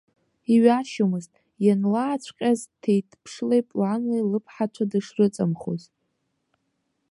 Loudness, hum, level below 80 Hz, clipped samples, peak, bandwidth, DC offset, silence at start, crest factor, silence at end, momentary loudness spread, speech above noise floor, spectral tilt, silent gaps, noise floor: -24 LUFS; none; -70 dBFS; under 0.1%; -4 dBFS; 11.5 kHz; under 0.1%; 0.5 s; 20 dB; 1.35 s; 11 LU; 52 dB; -7 dB/octave; none; -75 dBFS